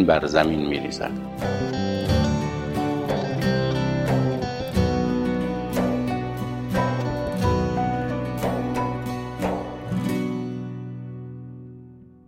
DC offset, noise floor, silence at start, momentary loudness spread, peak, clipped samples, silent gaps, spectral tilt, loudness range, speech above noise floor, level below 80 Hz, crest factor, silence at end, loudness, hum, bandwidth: under 0.1%; -45 dBFS; 0 s; 11 LU; -4 dBFS; under 0.1%; none; -7 dB/octave; 4 LU; 23 dB; -40 dBFS; 20 dB; 0.25 s; -25 LUFS; none; 16 kHz